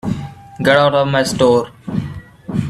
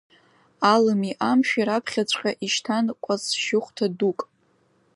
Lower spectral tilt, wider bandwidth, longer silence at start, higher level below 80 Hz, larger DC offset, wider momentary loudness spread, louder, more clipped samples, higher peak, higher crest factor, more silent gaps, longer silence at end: first, -5.5 dB/octave vs -4 dB/octave; first, 14.5 kHz vs 11.5 kHz; second, 0.05 s vs 0.6 s; first, -44 dBFS vs -74 dBFS; neither; first, 17 LU vs 7 LU; first, -15 LUFS vs -23 LUFS; neither; first, 0 dBFS vs -4 dBFS; about the same, 16 dB vs 20 dB; neither; second, 0 s vs 0.7 s